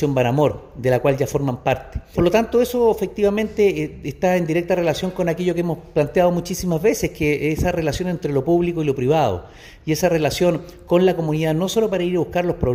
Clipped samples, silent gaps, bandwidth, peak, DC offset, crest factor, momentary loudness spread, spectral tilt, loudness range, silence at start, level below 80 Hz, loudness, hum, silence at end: under 0.1%; none; 16 kHz; -4 dBFS; under 0.1%; 16 dB; 5 LU; -6 dB/octave; 1 LU; 0 s; -40 dBFS; -20 LUFS; none; 0 s